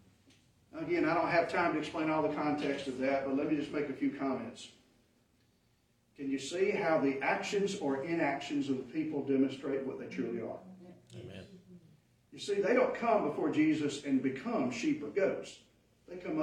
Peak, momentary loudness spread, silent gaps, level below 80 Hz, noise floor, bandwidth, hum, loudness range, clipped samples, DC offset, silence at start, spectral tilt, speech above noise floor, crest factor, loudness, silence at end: -16 dBFS; 16 LU; none; -74 dBFS; -72 dBFS; 10.5 kHz; none; 6 LU; under 0.1%; under 0.1%; 0.75 s; -5.5 dB/octave; 39 dB; 18 dB; -33 LUFS; 0 s